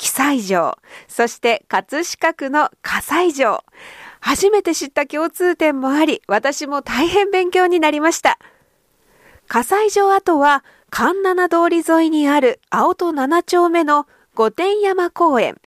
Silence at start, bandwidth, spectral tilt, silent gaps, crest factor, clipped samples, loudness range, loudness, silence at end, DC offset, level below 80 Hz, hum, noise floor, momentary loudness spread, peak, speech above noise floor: 0 s; 15.5 kHz; -3 dB/octave; none; 14 dB; under 0.1%; 3 LU; -17 LUFS; 0.2 s; under 0.1%; -54 dBFS; none; -59 dBFS; 7 LU; -2 dBFS; 43 dB